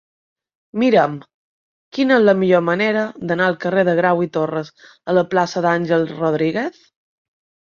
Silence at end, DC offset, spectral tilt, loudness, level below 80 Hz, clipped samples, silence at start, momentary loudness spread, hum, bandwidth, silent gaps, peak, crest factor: 1 s; under 0.1%; -7 dB/octave; -17 LUFS; -64 dBFS; under 0.1%; 0.75 s; 13 LU; none; 7.2 kHz; 1.34-1.92 s; -2 dBFS; 16 dB